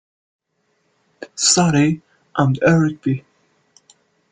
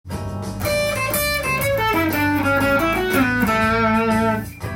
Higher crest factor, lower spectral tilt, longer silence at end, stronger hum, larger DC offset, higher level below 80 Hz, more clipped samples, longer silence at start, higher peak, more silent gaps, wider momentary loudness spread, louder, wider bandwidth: about the same, 18 dB vs 14 dB; about the same, -4.5 dB/octave vs -5 dB/octave; first, 1.15 s vs 0 s; neither; neither; second, -54 dBFS vs -38 dBFS; neither; first, 1.2 s vs 0.05 s; first, -2 dBFS vs -6 dBFS; neither; first, 15 LU vs 7 LU; about the same, -17 LUFS vs -19 LUFS; second, 9.6 kHz vs 17 kHz